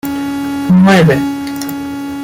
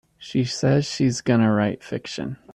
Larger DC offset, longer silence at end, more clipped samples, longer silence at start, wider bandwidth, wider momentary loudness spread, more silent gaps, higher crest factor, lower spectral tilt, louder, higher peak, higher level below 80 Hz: neither; second, 0 s vs 0.2 s; neither; second, 0.05 s vs 0.2 s; first, 17 kHz vs 11 kHz; about the same, 13 LU vs 12 LU; neither; about the same, 12 dB vs 16 dB; about the same, -6.5 dB/octave vs -6 dB/octave; first, -12 LUFS vs -22 LUFS; first, 0 dBFS vs -8 dBFS; first, -44 dBFS vs -56 dBFS